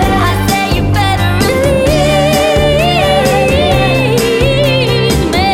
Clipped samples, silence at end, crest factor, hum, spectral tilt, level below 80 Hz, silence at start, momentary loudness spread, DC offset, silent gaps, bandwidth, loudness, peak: under 0.1%; 0 s; 10 dB; none; -5 dB/octave; -22 dBFS; 0 s; 2 LU; under 0.1%; none; 17 kHz; -10 LUFS; 0 dBFS